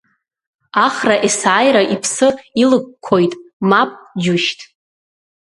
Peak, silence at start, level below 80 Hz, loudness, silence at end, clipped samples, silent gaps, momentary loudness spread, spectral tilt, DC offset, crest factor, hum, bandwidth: 0 dBFS; 0.75 s; -60 dBFS; -15 LUFS; 0.95 s; under 0.1%; 3.53-3.60 s; 8 LU; -4 dB/octave; under 0.1%; 16 dB; none; 11.5 kHz